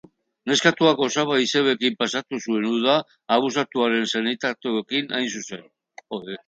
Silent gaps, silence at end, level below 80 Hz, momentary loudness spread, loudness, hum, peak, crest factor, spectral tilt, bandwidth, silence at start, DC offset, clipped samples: none; 0.1 s; -70 dBFS; 14 LU; -22 LUFS; none; -2 dBFS; 22 dB; -3.5 dB/octave; 9.2 kHz; 0.45 s; under 0.1%; under 0.1%